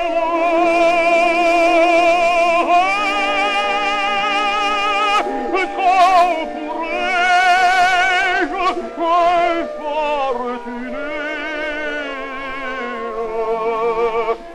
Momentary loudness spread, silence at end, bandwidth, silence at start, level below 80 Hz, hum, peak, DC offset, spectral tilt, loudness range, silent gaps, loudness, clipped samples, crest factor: 12 LU; 0 s; 12 kHz; 0 s; -44 dBFS; none; 0 dBFS; under 0.1%; -2.5 dB/octave; 9 LU; none; -16 LUFS; under 0.1%; 16 dB